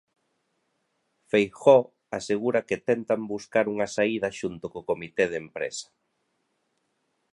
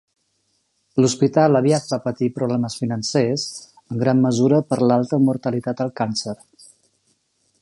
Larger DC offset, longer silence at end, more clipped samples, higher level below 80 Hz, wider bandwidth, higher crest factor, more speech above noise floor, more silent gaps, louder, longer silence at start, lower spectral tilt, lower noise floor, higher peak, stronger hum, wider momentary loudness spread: neither; first, 1.5 s vs 1.3 s; neither; about the same, -66 dBFS vs -62 dBFS; about the same, 11.5 kHz vs 11.5 kHz; about the same, 22 dB vs 18 dB; about the same, 50 dB vs 49 dB; neither; second, -26 LUFS vs -20 LUFS; first, 1.35 s vs 0.95 s; about the same, -5 dB/octave vs -6 dB/octave; first, -75 dBFS vs -68 dBFS; about the same, -4 dBFS vs -2 dBFS; neither; first, 14 LU vs 10 LU